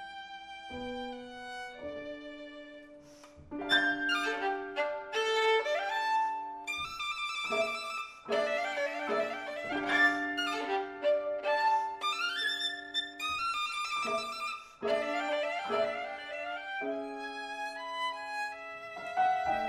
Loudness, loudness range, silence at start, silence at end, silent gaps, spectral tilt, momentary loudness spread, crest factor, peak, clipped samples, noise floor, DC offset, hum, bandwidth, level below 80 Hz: -33 LUFS; 6 LU; 0 s; 0 s; none; -2 dB/octave; 14 LU; 20 dB; -14 dBFS; under 0.1%; -54 dBFS; under 0.1%; none; 13.5 kHz; -68 dBFS